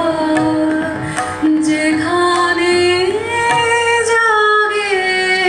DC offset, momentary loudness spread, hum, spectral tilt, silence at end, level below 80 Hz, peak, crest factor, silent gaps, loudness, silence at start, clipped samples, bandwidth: under 0.1%; 5 LU; none; -3.5 dB/octave; 0 s; -48 dBFS; -2 dBFS; 12 dB; none; -14 LUFS; 0 s; under 0.1%; 11.5 kHz